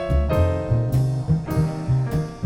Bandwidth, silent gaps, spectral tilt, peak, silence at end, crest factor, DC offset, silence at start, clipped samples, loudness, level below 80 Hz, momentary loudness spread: 16.5 kHz; none; -8.5 dB/octave; -8 dBFS; 0 s; 12 dB; 0.1%; 0 s; under 0.1%; -22 LUFS; -30 dBFS; 3 LU